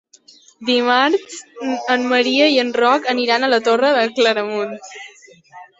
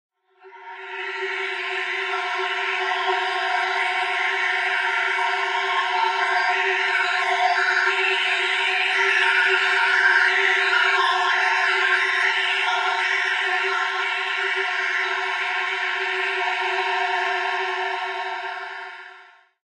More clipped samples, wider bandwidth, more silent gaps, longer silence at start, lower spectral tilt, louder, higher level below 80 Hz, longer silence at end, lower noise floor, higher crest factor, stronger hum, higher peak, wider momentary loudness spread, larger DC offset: neither; second, 8 kHz vs 11.5 kHz; neither; first, 0.6 s vs 0.45 s; first, -2.5 dB/octave vs 2.5 dB/octave; first, -16 LUFS vs -20 LUFS; first, -68 dBFS vs under -90 dBFS; second, 0.15 s vs 0.4 s; about the same, -48 dBFS vs -49 dBFS; about the same, 16 dB vs 16 dB; neither; first, -2 dBFS vs -6 dBFS; first, 13 LU vs 8 LU; neither